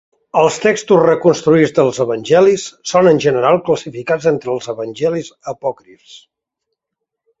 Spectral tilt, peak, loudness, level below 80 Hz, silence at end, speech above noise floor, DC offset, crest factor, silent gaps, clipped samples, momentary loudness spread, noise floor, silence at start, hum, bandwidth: -5.5 dB/octave; 0 dBFS; -14 LUFS; -56 dBFS; 1.25 s; 65 dB; under 0.1%; 14 dB; none; under 0.1%; 11 LU; -79 dBFS; 0.35 s; none; 8 kHz